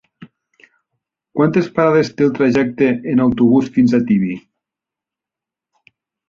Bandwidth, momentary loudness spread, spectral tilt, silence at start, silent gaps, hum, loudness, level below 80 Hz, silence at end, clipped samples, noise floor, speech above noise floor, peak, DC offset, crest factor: 7 kHz; 4 LU; -8 dB/octave; 0.2 s; none; none; -15 LUFS; -52 dBFS; 1.9 s; under 0.1%; -86 dBFS; 72 dB; -2 dBFS; under 0.1%; 16 dB